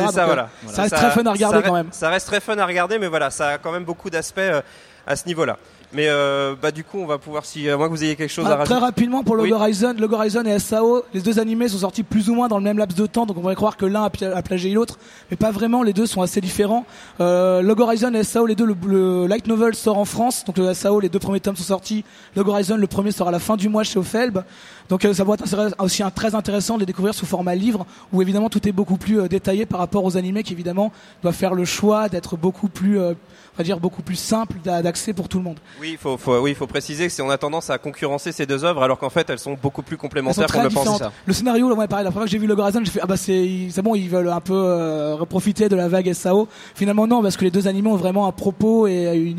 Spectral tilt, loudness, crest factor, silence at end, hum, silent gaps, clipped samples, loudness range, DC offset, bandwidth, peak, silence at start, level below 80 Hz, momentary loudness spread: -5.5 dB/octave; -20 LUFS; 18 dB; 0 s; none; none; under 0.1%; 4 LU; under 0.1%; 15.5 kHz; -2 dBFS; 0 s; -50 dBFS; 8 LU